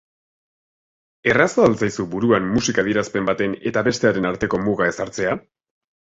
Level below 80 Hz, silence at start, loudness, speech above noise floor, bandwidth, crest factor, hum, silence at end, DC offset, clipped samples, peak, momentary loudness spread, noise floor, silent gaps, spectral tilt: -50 dBFS; 1.25 s; -20 LUFS; over 71 dB; 8 kHz; 20 dB; none; 0.75 s; under 0.1%; under 0.1%; -2 dBFS; 7 LU; under -90 dBFS; none; -5 dB/octave